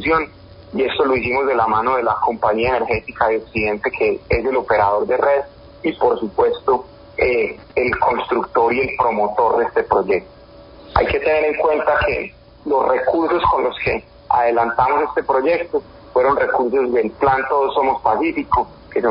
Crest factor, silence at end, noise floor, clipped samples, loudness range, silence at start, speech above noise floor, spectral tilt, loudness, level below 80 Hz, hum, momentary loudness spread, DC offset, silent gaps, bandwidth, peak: 18 dB; 0 s; -42 dBFS; under 0.1%; 1 LU; 0 s; 24 dB; -10.5 dB/octave; -18 LUFS; -40 dBFS; none; 5 LU; under 0.1%; none; 5.4 kHz; 0 dBFS